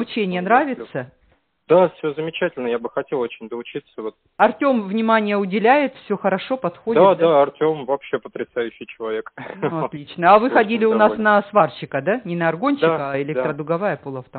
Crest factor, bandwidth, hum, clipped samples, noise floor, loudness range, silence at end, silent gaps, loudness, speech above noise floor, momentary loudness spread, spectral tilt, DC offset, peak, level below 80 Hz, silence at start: 18 dB; 4.5 kHz; none; under 0.1%; -61 dBFS; 5 LU; 0 s; none; -19 LUFS; 42 dB; 14 LU; -4.5 dB/octave; under 0.1%; 0 dBFS; -62 dBFS; 0 s